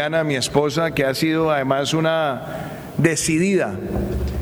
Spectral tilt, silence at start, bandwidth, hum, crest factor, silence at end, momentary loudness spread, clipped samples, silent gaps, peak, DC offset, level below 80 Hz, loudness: -5 dB/octave; 0 s; over 20 kHz; none; 18 dB; 0 s; 7 LU; under 0.1%; none; -2 dBFS; under 0.1%; -36 dBFS; -20 LUFS